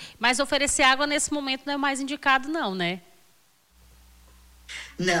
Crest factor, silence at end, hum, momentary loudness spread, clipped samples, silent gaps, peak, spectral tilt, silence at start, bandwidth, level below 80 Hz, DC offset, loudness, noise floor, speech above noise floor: 16 dB; 0 s; none; 15 LU; under 0.1%; none; -10 dBFS; -2 dB/octave; 0 s; 16.5 kHz; -52 dBFS; under 0.1%; -24 LUFS; -62 dBFS; 38 dB